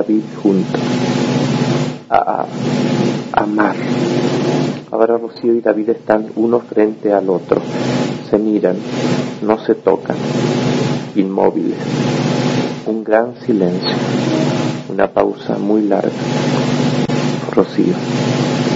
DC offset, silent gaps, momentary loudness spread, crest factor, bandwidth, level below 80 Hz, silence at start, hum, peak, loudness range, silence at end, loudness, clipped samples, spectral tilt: under 0.1%; none; 4 LU; 16 dB; 7.8 kHz; -52 dBFS; 0 s; none; 0 dBFS; 1 LU; 0 s; -16 LUFS; under 0.1%; -6.5 dB/octave